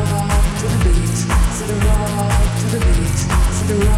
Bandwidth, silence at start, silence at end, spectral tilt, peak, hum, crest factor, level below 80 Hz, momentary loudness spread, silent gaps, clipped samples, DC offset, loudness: 15 kHz; 0 s; 0 s; -5.5 dB/octave; -6 dBFS; none; 10 dB; -18 dBFS; 2 LU; none; under 0.1%; 0.1%; -17 LUFS